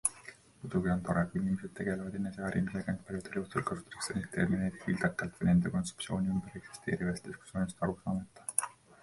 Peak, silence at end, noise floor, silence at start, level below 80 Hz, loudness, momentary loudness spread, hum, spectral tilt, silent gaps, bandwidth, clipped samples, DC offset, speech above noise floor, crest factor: -10 dBFS; 0.3 s; -54 dBFS; 0.05 s; -56 dBFS; -35 LUFS; 8 LU; none; -5.5 dB/octave; none; 11.5 kHz; under 0.1%; under 0.1%; 20 dB; 26 dB